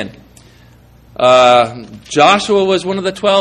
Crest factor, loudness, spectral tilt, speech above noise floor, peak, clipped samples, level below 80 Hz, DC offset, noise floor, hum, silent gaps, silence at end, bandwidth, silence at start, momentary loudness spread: 14 dB; -11 LUFS; -4 dB/octave; 32 dB; 0 dBFS; under 0.1%; -48 dBFS; under 0.1%; -43 dBFS; none; none; 0 s; 11 kHz; 0 s; 18 LU